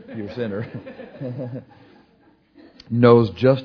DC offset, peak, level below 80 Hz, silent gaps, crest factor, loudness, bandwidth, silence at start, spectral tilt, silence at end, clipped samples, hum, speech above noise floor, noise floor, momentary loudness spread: under 0.1%; 0 dBFS; -58 dBFS; none; 22 dB; -19 LUFS; 5.4 kHz; 0.1 s; -10 dB/octave; 0 s; under 0.1%; none; 37 dB; -57 dBFS; 22 LU